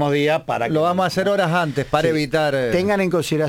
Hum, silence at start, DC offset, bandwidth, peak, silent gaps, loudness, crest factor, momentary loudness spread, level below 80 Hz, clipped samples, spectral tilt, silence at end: none; 0 s; under 0.1%; 17 kHz; -4 dBFS; none; -19 LUFS; 14 dB; 2 LU; -48 dBFS; under 0.1%; -6 dB/octave; 0 s